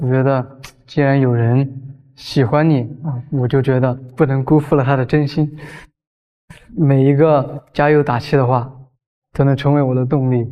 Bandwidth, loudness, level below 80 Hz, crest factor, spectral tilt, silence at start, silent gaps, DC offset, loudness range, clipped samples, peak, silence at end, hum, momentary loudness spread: 6.6 kHz; -16 LUFS; -46 dBFS; 16 dB; -9 dB/octave; 0 s; 6.07-6.48 s, 9.06-9.22 s; under 0.1%; 2 LU; under 0.1%; 0 dBFS; 0 s; none; 11 LU